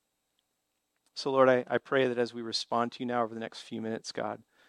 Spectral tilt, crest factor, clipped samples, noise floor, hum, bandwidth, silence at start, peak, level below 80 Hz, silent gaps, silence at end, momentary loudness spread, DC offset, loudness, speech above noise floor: -4.5 dB/octave; 22 dB; under 0.1%; -81 dBFS; none; 11 kHz; 1.15 s; -10 dBFS; -80 dBFS; none; 0.35 s; 14 LU; under 0.1%; -30 LUFS; 51 dB